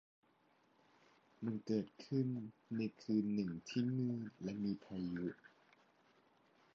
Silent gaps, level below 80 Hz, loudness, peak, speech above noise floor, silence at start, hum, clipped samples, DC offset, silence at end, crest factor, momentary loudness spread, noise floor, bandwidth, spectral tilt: none; -76 dBFS; -42 LUFS; -26 dBFS; 34 dB; 1.4 s; none; under 0.1%; under 0.1%; 1.3 s; 18 dB; 8 LU; -75 dBFS; 7.4 kHz; -8 dB/octave